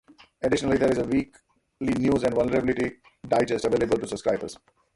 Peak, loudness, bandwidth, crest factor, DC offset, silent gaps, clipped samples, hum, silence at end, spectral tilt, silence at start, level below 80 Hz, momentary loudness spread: -10 dBFS; -25 LUFS; 11.5 kHz; 16 dB; under 0.1%; none; under 0.1%; none; 0.4 s; -6 dB/octave; 0.4 s; -50 dBFS; 8 LU